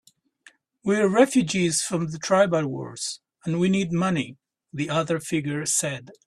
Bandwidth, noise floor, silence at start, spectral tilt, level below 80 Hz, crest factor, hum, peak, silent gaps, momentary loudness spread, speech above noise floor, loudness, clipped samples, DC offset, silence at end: 13 kHz; -57 dBFS; 0.85 s; -4.5 dB/octave; -62 dBFS; 20 dB; none; -4 dBFS; none; 12 LU; 33 dB; -24 LUFS; under 0.1%; under 0.1%; 0.15 s